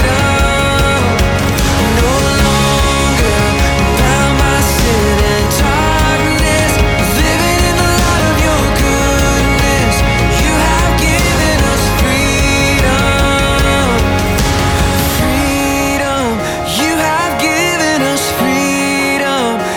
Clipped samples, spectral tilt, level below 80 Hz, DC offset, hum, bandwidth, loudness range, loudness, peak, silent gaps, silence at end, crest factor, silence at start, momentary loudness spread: under 0.1%; -4.5 dB/octave; -18 dBFS; under 0.1%; none; 19.5 kHz; 2 LU; -11 LUFS; -2 dBFS; none; 0 s; 10 dB; 0 s; 2 LU